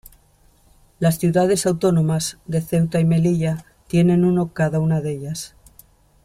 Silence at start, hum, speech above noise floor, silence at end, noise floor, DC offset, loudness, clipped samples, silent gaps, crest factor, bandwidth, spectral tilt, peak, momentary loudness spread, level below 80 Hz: 1 s; none; 37 dB; 0.75 s; -55 dBFS; under 0.1%; -19 LUFS; under 0.1%; none; 14 dB; 15 kHz; -6.5 dB/octave; -6 dBFS; 10 LU; -50 dBFS